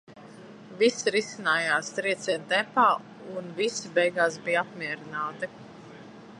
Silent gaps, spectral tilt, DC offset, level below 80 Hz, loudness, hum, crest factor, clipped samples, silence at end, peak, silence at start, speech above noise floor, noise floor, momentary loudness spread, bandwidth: none; -3 dB/octave; under 0.1%; -76 dBFS; -27 LUFS; none; 20 dB; under 0.1%; 0 s; -8 dBFS; 0.1 s; 20 dB; -47 dBFS; 23 LU; 11.5 kHz